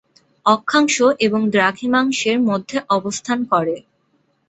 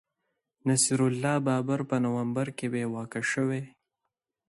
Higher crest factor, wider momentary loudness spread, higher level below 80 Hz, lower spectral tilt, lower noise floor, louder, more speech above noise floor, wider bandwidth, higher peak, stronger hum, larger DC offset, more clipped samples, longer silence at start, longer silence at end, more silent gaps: about the same, 16 dB vs 18 dB; about the same, 7 LU vs 9 LU; first, -62 dBFS vs -70 dBFS; about the same, -4 dB/octave vs -5 dB/octave; second, -63 dBFS vs -85 dBFS; first, -17 LUFS vs -28 LUFS; second, 46 dB vs 57 dB; second, 8.2 kHz vs 12 kHz; first, -2 dBFS vs -12 dBFS; neither; neither; neither; second, 0.45 s vs 0.65 s; about the same, 0.7 s vs 0.8 s; neither